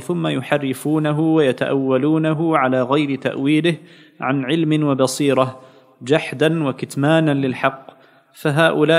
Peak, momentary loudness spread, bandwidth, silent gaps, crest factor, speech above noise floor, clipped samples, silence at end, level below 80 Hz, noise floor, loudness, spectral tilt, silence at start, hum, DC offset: 0 dBFS; 6 LU; 15.5 kHz; none; 18 dB; 28 dB; under 0.1%; 0 s; -70 dBFS; -46 dBFS; -18 LUFS; -6 dB/octave; 0 s; none; under 0.1%